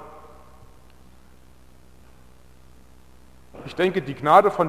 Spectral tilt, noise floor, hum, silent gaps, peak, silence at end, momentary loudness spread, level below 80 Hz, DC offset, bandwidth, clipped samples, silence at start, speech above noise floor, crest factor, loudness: -6.5 dB/octave; -53 dBFS; none; none; -2 dBFS; 0 s; 28 LU; -54 dBFS; 0.3%; 16 kHz; under 0.1%; 0 s; 34 dB; 24 dB; -20 LUFS